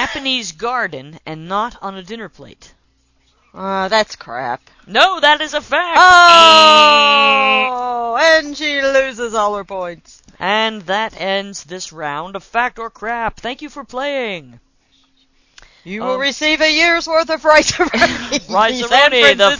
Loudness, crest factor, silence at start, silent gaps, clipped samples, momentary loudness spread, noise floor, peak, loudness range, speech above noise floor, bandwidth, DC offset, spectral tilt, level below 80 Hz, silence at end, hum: -12 LUFS; 14 dB; 0 s; none; 0.4%; 21 LU; -59 dBFS; 0 dBFS; 15 LU; 44 dB; 8 kHz; under 0.1%; -2 dB/octave; -48 dBFS; 0 s; none